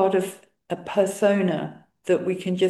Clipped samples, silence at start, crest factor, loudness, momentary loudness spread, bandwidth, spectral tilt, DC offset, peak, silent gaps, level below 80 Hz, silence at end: under 0.1%; 0 s; 16 dB; -24 LUFS; 13 LU; 12.5 kHz; -6 dB/octave; under 0.1%; -8 dBFS; none; -70 dBFS; 0 s